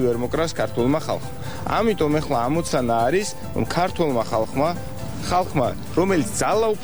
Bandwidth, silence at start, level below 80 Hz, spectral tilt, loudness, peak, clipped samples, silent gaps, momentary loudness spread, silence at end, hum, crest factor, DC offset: over 20 kHz; 0 s; -42 dBFS; -5.5 dB/octave; -22 LUFS; -6 dBFS; under 0.1%; none; 8 LU; 0 s; none; 14 dB; 2%